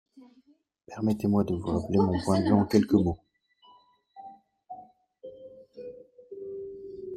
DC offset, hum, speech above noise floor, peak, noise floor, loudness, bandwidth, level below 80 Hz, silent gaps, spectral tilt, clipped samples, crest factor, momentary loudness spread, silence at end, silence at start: under 0.1%; none; 40 dB; -8 dBFS; -64 dBFS; -26 LUFS; 13.5 kHz; -58 dBFS; none; -8 dB/octave; under 0.1%; 22 dB; 25 LU; 0 s; 0.15 s